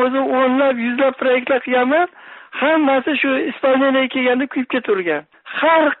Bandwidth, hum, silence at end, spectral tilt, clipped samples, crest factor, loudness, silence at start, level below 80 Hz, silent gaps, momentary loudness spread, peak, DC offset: 4.1 kHz; none; 0.05 s; -1 dB/octave; under 0.1%; 12 dB; -17 LUFS; 0 s; -66 dBFS; none; 6 LU; -4 dBFS; under 0.1%